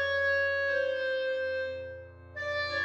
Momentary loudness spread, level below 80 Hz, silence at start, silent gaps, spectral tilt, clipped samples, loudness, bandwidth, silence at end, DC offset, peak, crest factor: 15 LU; -62 dBFS; 0 s; none; -4 dB/octave; under 0.1%; -30 LUFS; 8 kHz; 0 s; under 0.1%; -18 dBFS; 12 dB